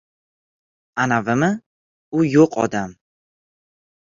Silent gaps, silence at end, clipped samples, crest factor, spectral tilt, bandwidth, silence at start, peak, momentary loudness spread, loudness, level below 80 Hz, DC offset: 1.66-2.12 s; 1.2 s; under 0.1%; 20 dB; -6.5 dB/octave; 7.6 kHz; 0.95 s; -2 dBFS; 14 LU; -19 LUFS; -58 dBFS; under 0.1%